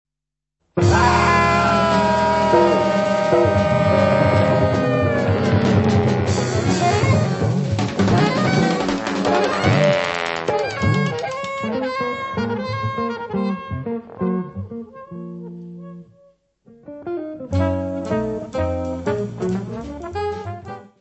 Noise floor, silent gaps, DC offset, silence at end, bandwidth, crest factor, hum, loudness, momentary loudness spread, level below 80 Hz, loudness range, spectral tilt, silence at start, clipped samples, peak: -84 dBFS; none; under 0.1%; 0.15 s; 8.4 kHz; 18 dB; none; -19 LUFS; 15 LU; -40 dBFS; 12 LU; -6.5 dB/octave; 0.75 s; under 0.1%; -2 dBFS